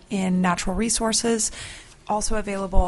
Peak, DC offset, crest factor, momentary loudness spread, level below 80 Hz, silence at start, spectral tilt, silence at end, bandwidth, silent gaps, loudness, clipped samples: -4 dBFS; under 0.1%; 18 dB; 13 LU; -30 dBFS; 0.1 s; -4 dB/octave; 0 s; 11.5 kHz; none; -23 LUFS; under 0.1%